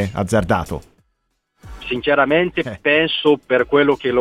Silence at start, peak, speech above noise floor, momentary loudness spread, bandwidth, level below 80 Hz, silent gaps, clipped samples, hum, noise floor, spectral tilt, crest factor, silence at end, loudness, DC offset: 0 s; -2 dBFS; 53 dB; 11 LU; 14 kHz; -42 dBFS; none; under 0.1%; none; -70 dBFS; -5.5 dB/octave; 16 dB; 0 s; -17 LUFS; under 0.1%